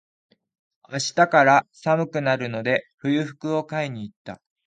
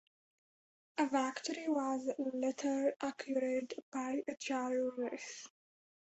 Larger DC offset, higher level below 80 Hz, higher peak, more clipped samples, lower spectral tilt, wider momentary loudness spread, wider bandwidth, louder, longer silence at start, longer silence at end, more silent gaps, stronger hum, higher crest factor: neither; first, -68 dBFS vs -82 dBFS; first, -2 dBFS vs -20 dBFS; neither; first, -5 dB/octave vs -2 dB/octave; first, 18 LU vs 9 LU; first, 9.4 kHz vs 8 kHz; first, -22 LUFS vs -38 LUFS; about the same, 0.9 s vs 0.95 s; second, 0.3 s vs 0.65 s; about the same, 2.94-2.98 s, 4.16-4.25 s vs 3.83-3.92 s; neither; about the same, 22 dB vs 18 dB